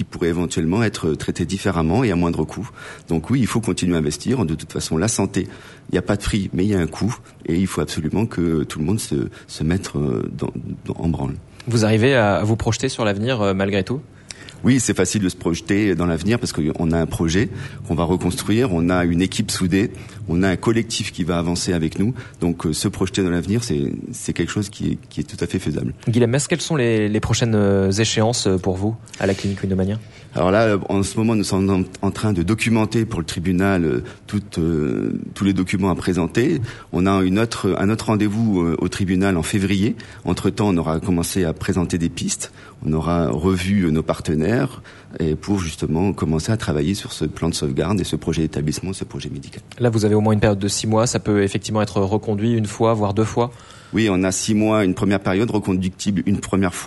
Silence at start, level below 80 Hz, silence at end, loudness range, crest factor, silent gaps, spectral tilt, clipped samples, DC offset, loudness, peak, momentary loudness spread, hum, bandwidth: 0 s; -40 dBFS; 0 s; 3 LU; 16 dB; none; -5.5 dB/octave; under 0.1%; under 0.1%; -20 LUFS; -4 dBFS; 8 LU; none; 12 kHz